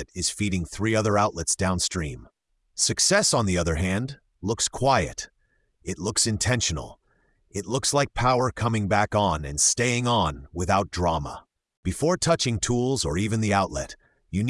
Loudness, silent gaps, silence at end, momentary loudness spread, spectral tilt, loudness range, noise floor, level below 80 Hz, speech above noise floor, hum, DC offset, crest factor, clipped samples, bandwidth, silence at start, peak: -24 LUFS; 11.77-11.83 s; 0 s; 14 LU; -3.5 dB/octave; 3 LU; -68 dBFS; -44 dBFS; 44 dB; none; under 0.1%; 18 dB; under 0.1%; 12 kHz; 0 s; -6 dBFS